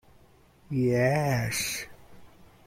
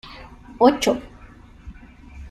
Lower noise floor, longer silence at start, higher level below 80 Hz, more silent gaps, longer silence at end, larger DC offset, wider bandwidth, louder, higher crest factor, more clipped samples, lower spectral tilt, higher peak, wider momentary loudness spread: first, -58 dBFS vs -45 dBFS; first, 0.7 s vs 0.05 s; second, -56 dBFS vs -44 dBFS; neither; first, 0.2 s vs 0 s; neither; first, 16.5 kHz vs 14 kHz; second, -27 LUFS vs -19 LUFS; about the same, 18 dB vs 22 dB; neither; about the same, -5 dB/octave vs -4.5 dB/octave; second, -12 dBFS vs -2 dBFS; second, 11 LU vs 26 LU